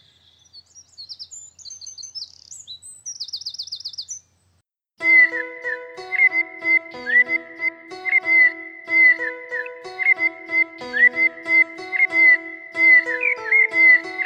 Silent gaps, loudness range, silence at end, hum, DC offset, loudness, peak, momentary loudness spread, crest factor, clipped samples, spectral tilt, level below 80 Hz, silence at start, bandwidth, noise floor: none; 17 LU; 0 s; none; under 0.1%; -16 LUFS; -4 dBFS; 22 LU; 16 dB; under 0.1%; -0.5 dB/octave; -72 dBFS; 0.55 s; 8.8 kHz; -67 dBFS